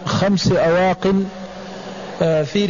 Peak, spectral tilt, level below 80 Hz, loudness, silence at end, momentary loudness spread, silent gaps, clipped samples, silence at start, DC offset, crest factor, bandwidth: -6 dBFS; -6 dB/octave; -44 dBFS; -17 LUFS; 0 s; 16 LU; none; under 0.1%; 0 s; 0.3%; 12 dB; 7.4 kHz